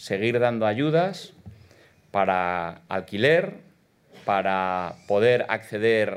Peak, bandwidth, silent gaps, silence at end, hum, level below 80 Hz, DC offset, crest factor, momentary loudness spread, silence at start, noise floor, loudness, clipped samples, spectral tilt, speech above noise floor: -6 dBFS; 13 kHz; none; 0 s; none; -70 dBFS; under 0.1%; 20 dB; 10 LU; 0 s; -57 dBFS; -24 LUFS; under 0.1%; -6 dB/octave; 34 dB